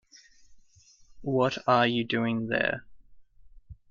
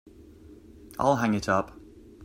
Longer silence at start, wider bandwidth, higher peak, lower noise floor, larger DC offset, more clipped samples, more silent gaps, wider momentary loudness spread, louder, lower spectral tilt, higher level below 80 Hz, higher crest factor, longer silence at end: about the same, 0.5 s vs 0.45 s; second, 7.4 kHz vs 16 kHz; about the same, -10 dBFS vs -8 dBFS; first, -59 dBFS vs -50 dBFS; neither; neither; neither; second, 9 LU vs 16 LU; about the same, -27 LUFS vs -26 LUFS; about the same, -6 dB/octave vs -6 dB/octave; second, -60 dBFS vs -54 dBFS; about the same, 20 dB vs 20 dB; first, 0.2 s vs 0 s